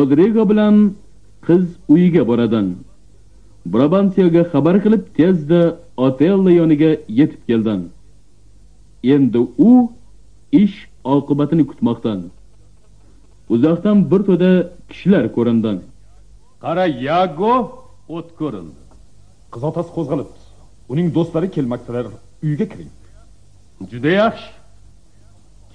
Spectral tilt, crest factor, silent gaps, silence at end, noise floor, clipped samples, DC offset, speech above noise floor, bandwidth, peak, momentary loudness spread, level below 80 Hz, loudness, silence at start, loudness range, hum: -9.5 dB/octave; 14 dB; none; 1.25 s; -49 dBFS; under 0.1%; 0.6%; 34 dB; 7.2 kHz; -2 dBFS; 15 LU; -48 dBFS; -16 LUFS; 0 s; 8 LU; 50 Hz at -50 dBFS